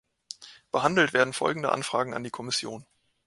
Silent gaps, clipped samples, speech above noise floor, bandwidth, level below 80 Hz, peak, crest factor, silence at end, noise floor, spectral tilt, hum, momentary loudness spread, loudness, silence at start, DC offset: none; under 0.1%; 20 dB; 11.5 kHz; -68 dBFS; -6 dBFS; 24 dB; 0.45 s; -47 dBFS; -3.5 dB/octave; none; 20 LU; -26 LUFS; 0.3 s; under 0.1%